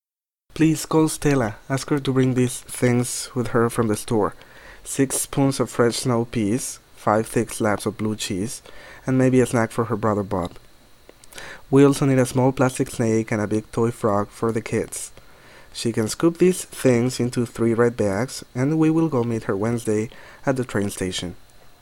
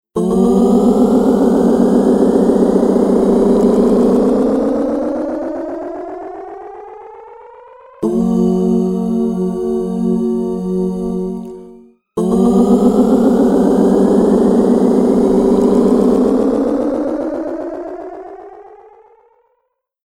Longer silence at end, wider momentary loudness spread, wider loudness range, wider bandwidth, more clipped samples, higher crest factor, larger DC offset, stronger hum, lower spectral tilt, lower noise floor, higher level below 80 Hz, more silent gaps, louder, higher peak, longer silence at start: second, 0.1 s vs 1.3 s; second, 10 LU vs 16 LU; second, 3 LU vs 9 LU; first, 16.5 kHz vs 12.5 kHz; neither; about the same, 18 dB vs 14 dB; neither; neither; second, -5.5 dB/octave vs -8.5 dB/octave; first, -89 dBFS vs -68 dBFS; second, -48 dBFS vs -40 dBFS; neither; second, -22 LUFS vs -13 LUFS; second, -4 dBFS vs 0 dBFS; first, 0.55 s vs 0.15 s